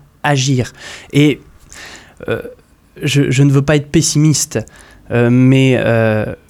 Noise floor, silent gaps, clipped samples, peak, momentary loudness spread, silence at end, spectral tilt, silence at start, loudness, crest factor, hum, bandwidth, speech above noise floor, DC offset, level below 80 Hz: -35 dBFS; none; under 0.1%; 0 dBFS; 21 LU; 0.15 s; -5.5 dB/octave; 0.25 s; -13 LUFS; 14 dB; none; 14 kHz; 23 dB; under 0.1%; -42 dBFS